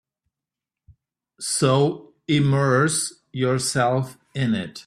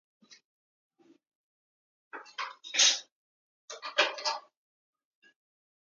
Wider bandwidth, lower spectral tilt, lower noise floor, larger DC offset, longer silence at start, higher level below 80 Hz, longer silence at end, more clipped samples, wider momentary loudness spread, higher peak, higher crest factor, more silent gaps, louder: first, 14 kHz vs 9.6 kHz; first, -5 dB/octave vs 3.5 dB/octave; about the same, -88 dBFS vs under -90 dBFS; neither; first, 1.4 s vs 0.3 s; first, -58 dBFS vs under -90 dBFS; second, 0.05 s vs 1.55 s; neither; second, 10 LU vs 24 LU; first, -6 dBFS vs -10 dBFS; second, 18 dB vs 26 dB; second, none vs 0.45-0.90 s, 1.27-2.11 s, 3.12-3.68 s; first, -22 LUFS vs -28 LUFS